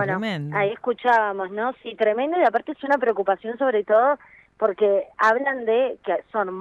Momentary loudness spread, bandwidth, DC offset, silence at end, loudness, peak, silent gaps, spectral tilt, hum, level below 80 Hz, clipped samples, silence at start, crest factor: 8 LU; 8 kHz; under 0.1%; 0 s; -22 LUFS; -6 dBFS; none; -6.5 dB/octave; none; -68 dBFS; under 0.1%; 0 s; 16 dB